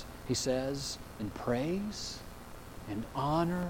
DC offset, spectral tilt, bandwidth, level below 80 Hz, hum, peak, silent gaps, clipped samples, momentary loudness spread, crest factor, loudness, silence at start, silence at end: under 0.1%; -5 dB/octave; 17 kHz; -52 dBFS; none; -16 dBFS; none; under 0.1%; 16 LU; 18 dB; -35 LUFS; 0 s; 0 s